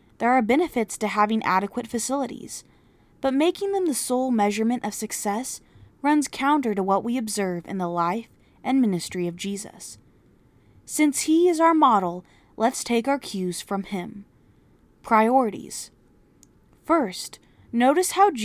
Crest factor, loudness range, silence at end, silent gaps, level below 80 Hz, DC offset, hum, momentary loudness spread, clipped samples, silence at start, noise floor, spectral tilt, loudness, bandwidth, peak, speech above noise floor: 18 dB; 5 LU; 0 s; none; -62 dBFS; under 0.1%; none; 15 LU; under 0.1%; 0.2 s; -57 dBFS; -4.5 dB/octave; -23 LUFS; 16 kHz; -6 dBFS; 34 dB